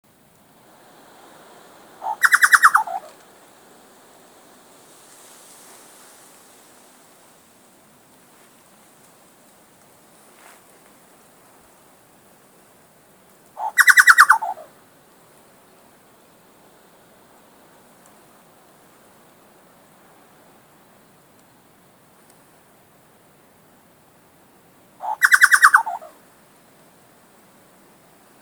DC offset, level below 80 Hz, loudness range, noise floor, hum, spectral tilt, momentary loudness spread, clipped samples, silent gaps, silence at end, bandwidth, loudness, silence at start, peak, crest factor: under 0.1%; -78 dBFS; 7 LU; -54 dBFS; none; 1.5 dB/octave; 23 LU; under 0.1%; none; 2.45 s; over 20 kHz; -14 LUFS; 2 s; 0 dBFS; 24 dB